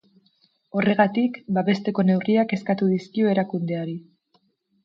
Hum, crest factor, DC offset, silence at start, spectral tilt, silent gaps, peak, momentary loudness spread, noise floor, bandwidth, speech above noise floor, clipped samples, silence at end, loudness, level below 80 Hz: none; 18 dB; under 0.1%; 0.75 s; -8.5 dB/octave; none; -4 dBFS; 9 LU; -67 dBFS; 6.8 kHz; 45 dB; under 0.1%; 0.85 s; -23 LUFS; -68 dBFS